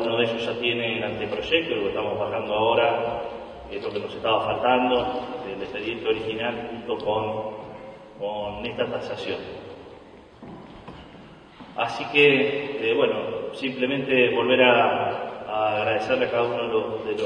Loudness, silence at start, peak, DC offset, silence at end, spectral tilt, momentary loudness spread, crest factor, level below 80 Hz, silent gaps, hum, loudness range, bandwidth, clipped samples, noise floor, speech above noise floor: -24 LUFS; 0 s; -2 dBFS; under 0.1%; 0 s; -6 dB/octave; 18 LU; 22 dB; -56 dBFS; none; none; 11 LU; 9.6 kHz; under 0.1%; -46 dBFS; 23 dB